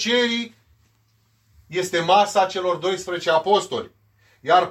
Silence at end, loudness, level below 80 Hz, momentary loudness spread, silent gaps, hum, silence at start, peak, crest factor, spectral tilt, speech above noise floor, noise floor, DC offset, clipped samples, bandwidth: 0 s; -21 LUFS; -66 dBFS; 13 LU; none; none; 0 s; -4 dBFS; 18 dB; -3 dB/octave; 43 dB; -63 dBFS; under 0.1%; under 0.1%; 15.5 kHz